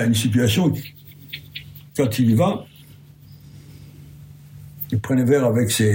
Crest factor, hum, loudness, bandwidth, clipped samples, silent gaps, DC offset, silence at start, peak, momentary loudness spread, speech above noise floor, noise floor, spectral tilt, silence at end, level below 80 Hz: 14 dB; none; -20 LUFS; 16.5 kHz; under 0.1%; none; under 0.1%; 0 s; -6 dBFS; 19 LU; 27 dB; -45 dBFS; -5.5 dB/octave; 0 s; -56 dBFS